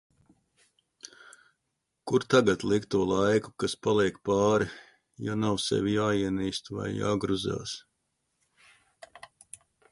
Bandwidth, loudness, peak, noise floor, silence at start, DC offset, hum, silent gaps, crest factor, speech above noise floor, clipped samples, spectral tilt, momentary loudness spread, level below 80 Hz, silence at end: 11.5 kHz; -28 LUFS; -8 dBFS; -81 dBFS; 1.05 s; under 0.1%; none; none; 22 dB; 54 dB; under 0.1%; -5.5 dB/octave; 24 LU; -58 dBFS; 2.1 s